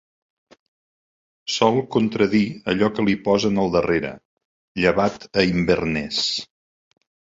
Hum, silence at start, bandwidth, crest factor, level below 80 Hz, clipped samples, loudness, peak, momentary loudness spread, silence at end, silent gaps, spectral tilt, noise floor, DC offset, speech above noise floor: none; 1.45 s; 7.8 kHz; 20 dB; -48 dBFS; under 0.1%; -21 LUFS; -4 dBFS; 5 LU; 0.95 s; 4.25-4.37 s, 4.45-4.75 s; -5 dB/octave; under -90 dBFS; under 0.1%; over 70 dB